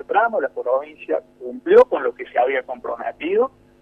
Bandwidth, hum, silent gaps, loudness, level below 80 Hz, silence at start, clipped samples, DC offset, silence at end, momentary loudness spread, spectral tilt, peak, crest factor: 5.2 kHz; none; none; -20 LUFS; -60 dBFS; 0.1 s; under 0.1%; under 0.1%; 0.35 s; 14 LU; -6 dB/octave; -2 dBFS; 18 dB